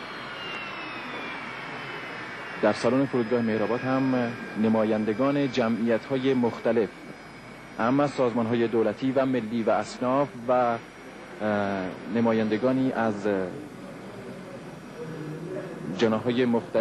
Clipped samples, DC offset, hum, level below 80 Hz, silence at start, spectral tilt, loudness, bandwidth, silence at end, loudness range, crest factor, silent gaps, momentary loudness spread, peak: under 0.1%; under 0.1%; none; -62 dBFS; 0 s; -6.5 dB/octave; -27 LUFS; 12 kHz; 0 s; 5 LU; 18 dB; none; 16 LU; -10 dBFS